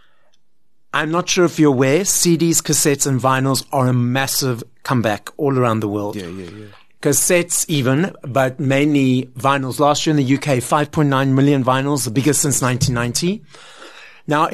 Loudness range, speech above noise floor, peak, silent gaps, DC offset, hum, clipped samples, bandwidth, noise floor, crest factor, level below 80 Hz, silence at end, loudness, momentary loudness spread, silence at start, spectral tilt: 3 LU; 56 dB; -2 dBFS; none; under 0.1%; none; under 0.1%; 13.5 kHz; -72 dBFS; 16 dB; -50 dBFS; 0 s; -17 LUFS; 8 LU; 0.95 s; -4.5 dB/octave